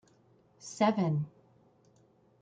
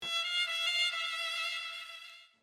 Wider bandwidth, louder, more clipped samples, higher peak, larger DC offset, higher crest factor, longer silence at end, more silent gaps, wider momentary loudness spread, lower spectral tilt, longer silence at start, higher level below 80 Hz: second, 9.2 kHz vs 16 kHz; about the same, -31 LUFS vs -32 LUFS; neither; first, -14 dBFS vs -20 dBFS; neither; first, 22 dB vs 16 dB; first, 1.15 s vs 0.15 s; neither; first, 19 LU vs 16 LU; first, -6.5 dB/octave vs 2.5 dB/octave; first, 0.65 s vs 0 s; first, -76 dBFS vs -84 dBFS